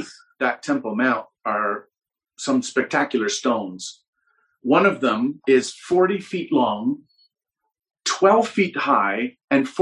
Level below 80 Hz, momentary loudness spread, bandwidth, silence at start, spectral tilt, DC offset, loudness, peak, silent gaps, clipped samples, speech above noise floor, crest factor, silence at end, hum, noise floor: -70 dBFS; 11 LU; 11 kHz; 0 s; -4 dB/octave; under 0.1%; -21 LUFS; -4 dBFS; 4.08-4.13 s, 9.44-9.48 s; under 0.1%; 60 dB; 18 dB; 0 s; none; -80 dBFS